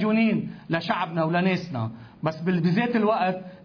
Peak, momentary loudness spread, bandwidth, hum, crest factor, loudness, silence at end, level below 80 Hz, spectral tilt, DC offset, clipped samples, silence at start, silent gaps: -10 dBFS; 9 LU; 5.4 kHz; none; 14 dB; -25 LUFS; 0.05 s; -64 dBFS; -8 dB/octave; under 0.1%; under 0.1%; 0 s; none